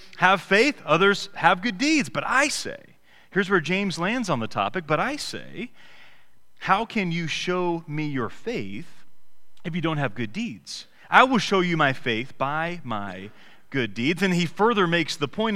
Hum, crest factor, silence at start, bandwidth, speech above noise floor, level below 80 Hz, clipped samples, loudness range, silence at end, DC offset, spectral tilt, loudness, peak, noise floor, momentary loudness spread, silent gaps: none; 24 dB; 0 s; 15.5 kHz; 44 dB; -56 dBFS; under 0.1%; 6 LU; 0 s; 0.9%; -4.5 dB/octave; -23 LUFS; 0 dBFS; -68 dBFS; 16 LU; none